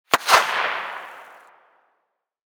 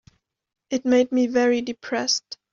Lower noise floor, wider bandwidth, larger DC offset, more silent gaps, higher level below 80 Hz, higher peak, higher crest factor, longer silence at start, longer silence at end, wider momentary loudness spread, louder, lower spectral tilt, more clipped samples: first, -75 dBFS vs -58 dBFS; first, over 20 kHz vs 7.4 kHz; neither; neither; about the same, -66 dBFS vs -66 dBFS; first, -2 dBFS vs -8 dBFS; first, 22 dB vs 16 dB; second, 0.1 s vs 0.7 s; first, 1.35 s vs 0.2 s; first, 20 LU vs 8 LU; first, -19 LUFS vs -22 LUFS; second, 0 dB/octave vs -1.5 dB/octave; neither